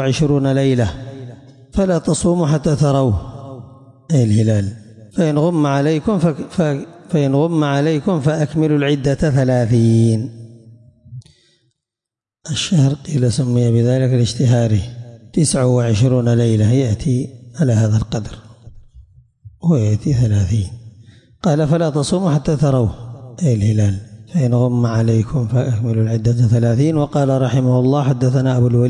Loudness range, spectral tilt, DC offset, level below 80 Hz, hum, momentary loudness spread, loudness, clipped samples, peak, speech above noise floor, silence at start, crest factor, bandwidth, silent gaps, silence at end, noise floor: 4 LU; -7 dB/octave; under 0.1%; -42 dBFS; none; 9 LU; -16 LUFS; under 0.1%; -4 dBFS; 72 dB; 0 s; 12 dB; 10.5 kHz; none; 0 s; -87 dBFS